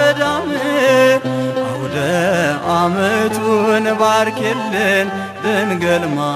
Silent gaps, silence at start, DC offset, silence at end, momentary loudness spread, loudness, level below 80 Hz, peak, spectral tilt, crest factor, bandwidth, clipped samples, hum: none; 0 s; under 0.1%; 0 s; 6 LU; -15 LUFS; -54 dBFS; -2 dBFS; -5 dB/octave; 14 dB; 15 kHz; under 0.1%; none